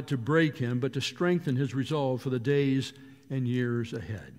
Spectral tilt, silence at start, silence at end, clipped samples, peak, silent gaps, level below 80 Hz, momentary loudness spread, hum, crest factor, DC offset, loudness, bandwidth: -6.5 dB/octave; 0 s; 0 s; under 0.1%; -12 dBFS; none; -64 dBFS; 8 LU; none; 18 dB; under 0.1%; -29 LUFS; 14 kHz